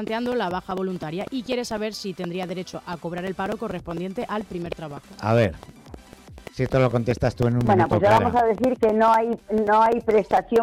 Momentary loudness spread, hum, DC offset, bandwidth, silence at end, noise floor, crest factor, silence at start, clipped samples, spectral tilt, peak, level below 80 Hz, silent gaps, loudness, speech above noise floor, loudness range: 14 LU; none; under 0.1%; 16.5 kHz; 0 s; -45 dBFS; 12 dB; 0 s; under 0.1%; -7 dB/octave; -10 dBFS; -48 dBFS; none; -23 LUFS; 23 dB; 10 LU